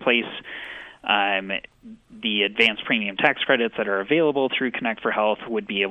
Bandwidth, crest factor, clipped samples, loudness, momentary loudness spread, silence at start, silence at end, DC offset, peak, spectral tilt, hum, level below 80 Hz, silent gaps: 9.2 kHz; 20 dB; under 0.1%; -22 LUFS; 12 LU; 0 s; 0 s; under 0.1%; -4 dBFS; -5.5 dB/octave; none; -64 dBFS; none